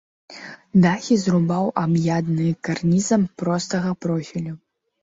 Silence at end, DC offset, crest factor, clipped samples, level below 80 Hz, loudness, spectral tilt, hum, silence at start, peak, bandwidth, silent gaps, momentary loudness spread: 0.45 s; under 0.1%; 16 dB; under 0.1%; -58 dBFS; -21 LUFS; -6.5 dB/octave; none; 0.3 s; -6 dBFS; 7.8 kHz; none; 14 LU